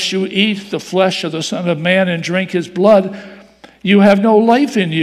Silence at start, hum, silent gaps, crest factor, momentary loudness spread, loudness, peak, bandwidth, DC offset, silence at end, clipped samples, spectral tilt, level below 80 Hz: 0 s; none; none; 14 dB; 10 LU; -14 LUFS; 0 dBFS; 13 kHz; under 0.1%; 0 s; 0.2%; -5.5 dB/octave; -58 dBFS